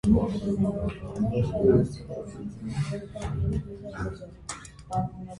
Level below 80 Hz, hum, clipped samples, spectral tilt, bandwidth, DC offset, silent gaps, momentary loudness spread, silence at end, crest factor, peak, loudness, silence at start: -40 dBFS; none; under 0.1%; -8 dB/octave; 11.5 kHz; under 0.1%; none; 16 LU; 0 s; 18 dB; -10 dBFS; -29 LUFS; 0.05 s